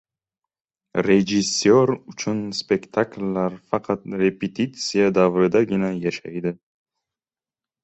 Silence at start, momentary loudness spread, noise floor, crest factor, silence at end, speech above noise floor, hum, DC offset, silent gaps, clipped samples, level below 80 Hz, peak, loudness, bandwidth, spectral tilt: 0.95 s; 10 LU; under -90 dBFS; 18 dB; 1.3 s; over 69 dB; none; under 0.1%; none; under 0.1%; -58 dBFS; -4 dBFS; -21 LUFS; 8.2 kHz; -5 dB/octave